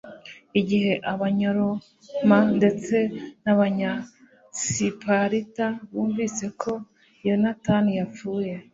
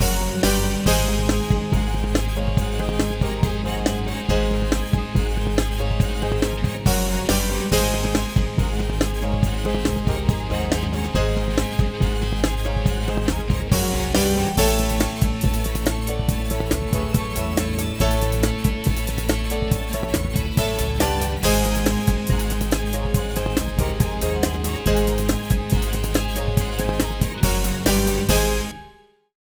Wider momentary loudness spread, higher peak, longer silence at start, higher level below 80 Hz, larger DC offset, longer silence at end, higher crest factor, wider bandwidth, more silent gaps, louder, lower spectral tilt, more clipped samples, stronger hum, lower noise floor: first, 10 LU vs 4 LU; about the same, -4 dBFS vs -4 dBFS; about the same, 0.05 s vs 0 s; second, -60 dBFS vs -24 dBFS; neither; second, 0.1 s vs 0.5 s; about the same, 20 dB vs 18 dB; second, 7.8 kHz vs over 20 kHz; neither; about the same, -24 LUFS vs -22 LUFS; about the same, -5.5 dB/octave vs -5 dB/octave; neither; neither; second, -44 dBFS vs -50 dBFS